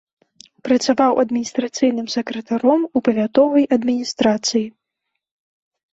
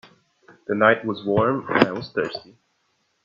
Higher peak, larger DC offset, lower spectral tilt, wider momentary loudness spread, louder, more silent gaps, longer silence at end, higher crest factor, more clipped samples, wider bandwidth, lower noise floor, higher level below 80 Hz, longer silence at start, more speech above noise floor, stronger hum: second, -4 dBFS vs 0 dBFS; neither; second, -4 dB/octave vs -7.5 dB/octave; second, 9 LU vs 12 LU; first, -18 LUFS vs -21 LUFS; neither; first, 1.25 s vs 0.85 s; second, 16 dB vs 24 dB; neither; about the same, 8 kHz vs 7.4 kHz; first, -78 dBFS vs -69 dBFS; about the same, -62 dBFS vs -62 dBFS; about the same, 0.65 s vs 0.7 s; first, 61 dB vs 48 dB; neither